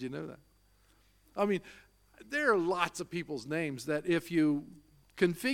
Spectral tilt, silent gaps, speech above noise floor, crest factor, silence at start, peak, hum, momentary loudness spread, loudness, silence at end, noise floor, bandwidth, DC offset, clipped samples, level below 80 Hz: -5.5 dB/octave; none; 34 dB; 22 dB; 0 s; -12 dBFS; none; 14 LU; -33 LUFS; 0 s; -66 dBFS; 16.5 kHz; under 0.1%; under 0.1%; -68 dBFS